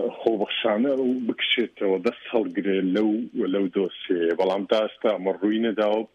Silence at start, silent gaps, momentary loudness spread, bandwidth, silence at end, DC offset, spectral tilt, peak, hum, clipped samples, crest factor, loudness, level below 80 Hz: 0 s; none; 3 LU; 7.4 kHz; 0.1 s; under 0.1%; -6.5 dB/octave; -6 dBFS; none; under 0.1%; 18 dB; -24 LUFS; -74 dBFS